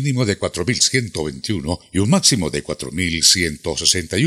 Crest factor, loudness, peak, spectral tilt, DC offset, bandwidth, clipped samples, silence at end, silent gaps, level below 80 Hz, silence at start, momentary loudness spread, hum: 18 dB; -17 LUFS; 0 dBFS; -3 dB/octave; under 0.1%; 14.5 kHz; under 0.1%; 0 s; none; -44 dBFS; 0 s; 11 LU; none